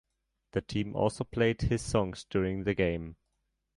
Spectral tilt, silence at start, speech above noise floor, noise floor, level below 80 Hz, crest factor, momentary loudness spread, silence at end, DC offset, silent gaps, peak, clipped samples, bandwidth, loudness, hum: -6 dB/octave; 0.55 s; 50 dB; -80 dBFS; -48 dBFS; 18 dB; 8 LU; 0.65 s; under 0.1%; none; -14 dBFS; under 0.1%; 11.5 kHz; -31 LUFS; none